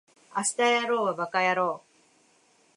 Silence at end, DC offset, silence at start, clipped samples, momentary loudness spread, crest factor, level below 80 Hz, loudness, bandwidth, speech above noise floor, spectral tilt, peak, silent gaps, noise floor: 1 s; under 0.1%; 0.35 s; under 0.1%; 9 LU; 16 dB; -84 dBFS; -26 LUFS; 11.5 kHz; 38 dB; -2.5 dB/octave; -12 dBFS; none; -64 dBFS